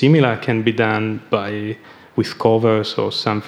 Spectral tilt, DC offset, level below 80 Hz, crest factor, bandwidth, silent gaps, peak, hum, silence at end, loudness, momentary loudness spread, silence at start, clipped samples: -7 dB/octave; under 0.1%; -64 dBFS; 16 dB; 11.5 kHz; none; 0 dBFS; none; 0 s; -18 LUFS; 11 LU; 0 s; under 0.1%